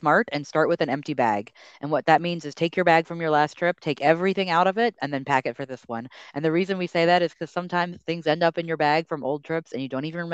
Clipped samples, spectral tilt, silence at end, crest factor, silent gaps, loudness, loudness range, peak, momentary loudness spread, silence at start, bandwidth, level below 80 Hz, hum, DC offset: under 0.1%; -6 dB/octave; 0 s; 20 dB; none; -24 LUFS; 3 LU; -4 dBFS; 11 LU; 0 s; 8.2 kHz; -72 dBFS; none; under 0.1%